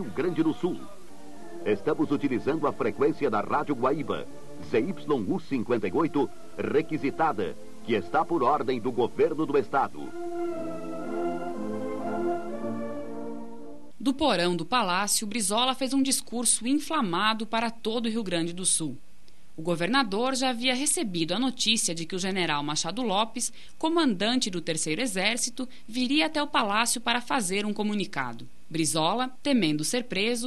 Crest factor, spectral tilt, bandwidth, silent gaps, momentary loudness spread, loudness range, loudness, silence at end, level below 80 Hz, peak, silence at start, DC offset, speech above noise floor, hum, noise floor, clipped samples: 20 dB; -3 dB/octave; 12.5 kHz; none; 11 LU; 4 LU; -27 LUFS; 0 s; -62 dBFS; -8 dBFS; 0 s; 1%; 32 dB; none; -59 dBFS; under 0.1%